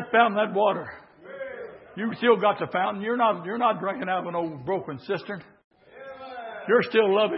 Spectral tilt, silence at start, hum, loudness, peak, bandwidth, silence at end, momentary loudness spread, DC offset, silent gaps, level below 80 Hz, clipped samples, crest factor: -9.5 dB/octave; 0 s; none; -25 LUFS; -4 dBFS; 5.8 kHz; 0 s; 19 LU; under 0.1%; 5.64-5.71 s; -72 dBFS; under 0.1%; 20 dB